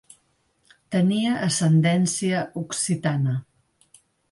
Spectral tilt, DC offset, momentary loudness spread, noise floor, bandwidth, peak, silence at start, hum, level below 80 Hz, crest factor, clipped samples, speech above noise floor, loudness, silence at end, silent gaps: -5 dB/octave; under 0.1%; 8 LU; -67 dBFS; 11.5 kHz; -10 dBFS; 0.9 s; none; -64 dBFS; 14 dB; under 0.1%; 45 dB; -23 LUFS; 0.9 s; none